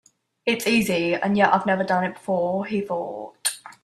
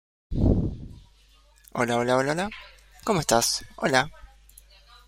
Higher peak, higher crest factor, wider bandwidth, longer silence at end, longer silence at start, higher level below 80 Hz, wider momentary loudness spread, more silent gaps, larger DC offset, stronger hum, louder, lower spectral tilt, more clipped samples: about the same, -4 dBFS vs -4 dBFS; about the same, 20 dB vs 24 dB; about the same, 15 kHz vs 16.5 kHz; second, 0.15 s vs 1 s; first, 0.45 s vs 0.3 s; second, -62 dBFS vs -38 dBFS; second, 9 LU vs 14 LU; neither; neither; neither; about the same, -23 LUFS vs -25 LUFS; about the same, -4 dB/octave vs -4 dB/octave; neither